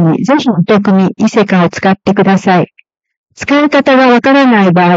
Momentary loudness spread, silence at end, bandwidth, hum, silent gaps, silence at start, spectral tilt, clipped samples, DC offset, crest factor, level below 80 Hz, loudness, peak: 5 LU; 0 s; 7.8 kHz; none; 3.17-3.24 s; 0 s; -7 dB/octave; under 0.1%; under 0.1%; 8 dB; -52 dBFS; -9 LUFS; 0 dBFS